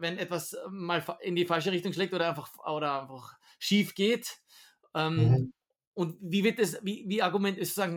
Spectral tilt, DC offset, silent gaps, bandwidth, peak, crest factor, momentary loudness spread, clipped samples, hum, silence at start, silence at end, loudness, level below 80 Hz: -5.5 dB/octave; under 0.1%; 5.87-5.92 s; 19 kHz; -14 dBFS; 18 dB; 12 LU; under 0.1%; none; 0 s; 0 s; -30 LUFS; -64 dBFS